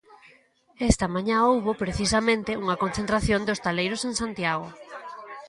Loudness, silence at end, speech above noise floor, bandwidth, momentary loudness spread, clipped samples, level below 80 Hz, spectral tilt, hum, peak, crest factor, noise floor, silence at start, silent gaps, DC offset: -25 LUFS; 0 s; 34 dB; 11.5 kHz; 14 LU; under 0.1%; -42 dBFS; -4.5 dB/octave; none; -4 dBFS; 22 dB; -59 dBFS; 0.1 s; none; under 0.1%